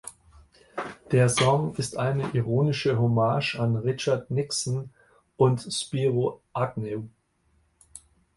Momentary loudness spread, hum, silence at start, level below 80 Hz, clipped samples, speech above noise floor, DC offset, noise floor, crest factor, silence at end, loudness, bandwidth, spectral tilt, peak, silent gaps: 14 LU; none; 0.05 s; -58 dBFS; under 0.1%; 43 dB; under 0.1%; -67 dBFS; 18 dB; 0.4 s; -26 LUFS; 11.5 kHz; -5.5 dB/octave; -8 dBFS; none